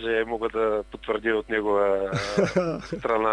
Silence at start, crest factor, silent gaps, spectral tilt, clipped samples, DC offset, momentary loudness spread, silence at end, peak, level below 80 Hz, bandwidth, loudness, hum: 0 s; 16 dB; none; -6 dB/octave; under 0.1%; under 0.1%; 7 LU; 0 s; -10 dBFS; -50 dBFS; 10.5 kHz; -25 LUFS; none